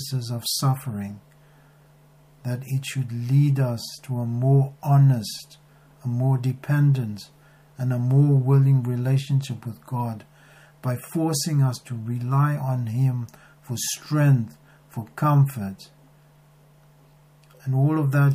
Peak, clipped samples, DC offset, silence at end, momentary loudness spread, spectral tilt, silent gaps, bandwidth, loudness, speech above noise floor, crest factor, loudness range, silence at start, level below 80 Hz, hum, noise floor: -8 dBFS; under 0.1%; under 0.1%; 0 s; 16 LU; -6.5 dB/octave; none; 15.5 kHz; -23 LUFS; 32 dB; 14 dB; 5 LU; 0 s; -66 dBFS; none; -54 dBFS